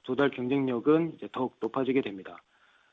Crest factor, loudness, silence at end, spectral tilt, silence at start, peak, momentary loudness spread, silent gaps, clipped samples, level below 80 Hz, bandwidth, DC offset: 18 dB; -29 LUFS; 0.55 s; -8.5 dB/octave; 0.05 s; -12 dBFS; 12 LU; none; under 0.1%; -68 dBFS; 5.8 kHz; under 0.1%